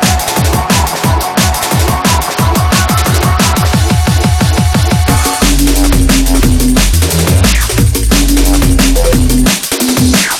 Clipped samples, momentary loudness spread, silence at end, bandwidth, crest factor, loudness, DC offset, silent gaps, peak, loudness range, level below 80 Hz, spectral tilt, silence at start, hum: under 0.1%; 2 LU; 0 s; 18.5 kHz; 8 dB; -10 LUFS; under 0.1%; none; 0 dBFS; 1 LU; -14 dBFS; -4 dB/octave; 0 s; none